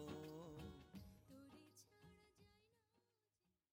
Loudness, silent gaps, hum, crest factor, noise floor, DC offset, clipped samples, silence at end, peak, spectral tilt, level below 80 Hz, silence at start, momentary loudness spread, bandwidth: -60 LUFS; none; none; 20 dB; under -90 dBFS; under 0.1%; under 0.1%; 0.75 s; -40 dBFS; -6 dB/octave; -74 dBFS; 0 s; 13 LU; 16 kHz